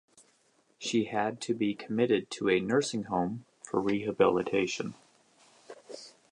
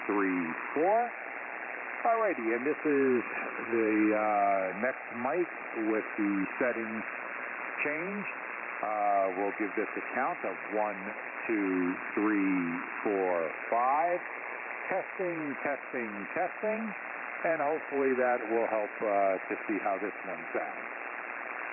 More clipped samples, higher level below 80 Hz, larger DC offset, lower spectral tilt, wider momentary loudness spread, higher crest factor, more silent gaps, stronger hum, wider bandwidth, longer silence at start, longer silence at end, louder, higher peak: neither; first, -68 dBFS vs -78 dBFS; neither; first, -5 dB/octave vs 0.5 dB/octave; first, 15 LU vs 9 LU; first, 20 dB vs 14 dB; neither; neither; first, 11 kHz vs 3 kHz; first, 0.8 s vs 0 s; first, 0.25 s vs 0 s; about the same, -30 LUFS vs -32 LUFS; first, -10 dBFS vs -16 dBFS